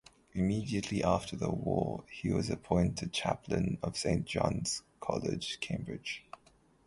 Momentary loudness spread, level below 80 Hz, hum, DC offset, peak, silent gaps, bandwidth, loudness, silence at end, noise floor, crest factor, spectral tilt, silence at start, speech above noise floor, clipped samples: 8 LU; -52 dBFS; none; under 0.1%; -12 dBFS; none; 11.5 kHz; -34 LUFS; 0.65 s; -66 dBFS; 22 dB; -5.5 dB/octave; 0.35 s; 32 dB; under 0.1%